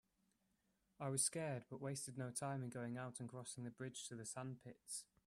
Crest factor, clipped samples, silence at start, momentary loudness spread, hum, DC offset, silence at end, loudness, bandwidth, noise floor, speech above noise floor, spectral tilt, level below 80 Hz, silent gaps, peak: 22 dB; under 0.1%; 1 s; 11 LU; none; under 0.1%; 0.25 s; -47 LUFS; 15 kHz; -84 dBFS; 36 dB; -4 dB/octave; -84 dBFS; none; -26 dBFS